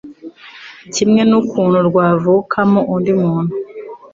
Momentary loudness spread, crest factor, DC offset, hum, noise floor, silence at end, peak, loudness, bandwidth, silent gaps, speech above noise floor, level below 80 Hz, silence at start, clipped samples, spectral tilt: 22 LU; 12 dB; under 0.1%; none; -37 dBFS; 0.1 s; -2 dBFS; -14 LUFS; 7.8 kHz; none; 24 dB; -54 dBFS; 0.05 s; under 0.1%; -6.5 dB/octave